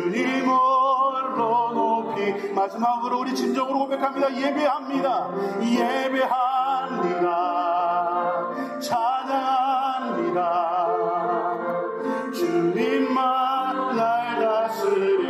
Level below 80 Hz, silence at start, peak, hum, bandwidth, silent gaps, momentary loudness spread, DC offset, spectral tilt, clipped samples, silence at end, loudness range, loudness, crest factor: -84 dBFS; 0 s; -10 dBFS; none; 15.5 kHz; none; 5 LU; under 0.1%; -5.5 dB/octave; under 0.1%; 0 s; 1 LU; -23 LUFS; 14 dB